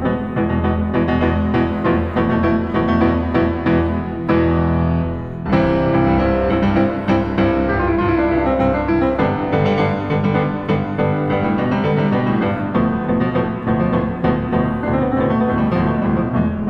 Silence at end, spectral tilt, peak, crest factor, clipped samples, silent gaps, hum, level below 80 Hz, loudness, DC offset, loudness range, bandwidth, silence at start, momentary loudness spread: 0 s; -9.5 dB/octave; -2 dBFS; 14 dB; under 0.1%; none; none; -32 dBFS; -17 LUFS; under 0.1%; 1 LU; 6 kHz; 0 s; 3 LU